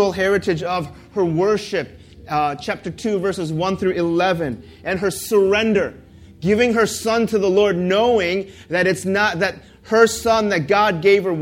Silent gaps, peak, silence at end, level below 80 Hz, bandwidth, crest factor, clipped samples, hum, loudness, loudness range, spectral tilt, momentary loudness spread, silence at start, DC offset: none; 0 dBFS; 0 s; -48 dBFS; 16.5 kHz; 18 dB; under 0.1%; none; -19 LUFS; 4 LU; -5 dB/octave; 10 LU; 0 s; under 0.1%